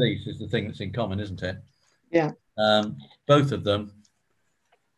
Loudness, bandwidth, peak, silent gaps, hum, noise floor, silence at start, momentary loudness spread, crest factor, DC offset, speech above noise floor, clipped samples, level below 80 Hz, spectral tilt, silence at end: -26 LUFS; 11 kHz; -6 dBFS; none; none; -74 dBFS; 0 s; 13 LU; 20 dB; under 0.1%; 49 dB; under 0.1%; -52 dBFS; -6.5 dB/octave; 1.1 s